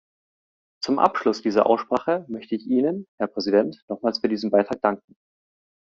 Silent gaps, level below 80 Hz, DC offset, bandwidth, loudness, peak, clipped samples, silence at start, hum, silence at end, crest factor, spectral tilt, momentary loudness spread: 3.08-3.18 s, 3.82-3.88 s; -66 dBFS; under 0.1%; 7.6 kHz; -23 LUFS; -2 dBFS; under 0.1%; 0.8 s; none; 0.9 s; 22 dB; -4 dB/octave; 9 LU